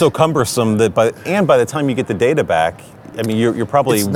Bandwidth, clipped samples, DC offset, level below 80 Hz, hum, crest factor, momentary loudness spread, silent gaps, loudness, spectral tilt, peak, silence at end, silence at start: 19 kHz; under 0.1%; under 0.1%; -52 dBFS; none; 16 dB; 6 LU; none; -16 LUFS; -5.5 dB/octave; 0 dBFS; 0 s; 0 s